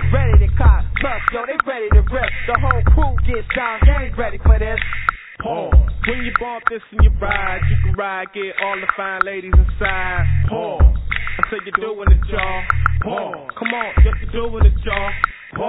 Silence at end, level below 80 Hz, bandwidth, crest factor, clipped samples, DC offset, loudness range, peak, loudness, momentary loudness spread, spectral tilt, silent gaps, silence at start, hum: 0 s; -18 dBFS; 4 kHz; 16 dB; under 0.1%; under 0.1%; 2 LU; 0 dBFS; -18 LUFS; 7 LU; -10.5 dB/octave; none; 0 s; none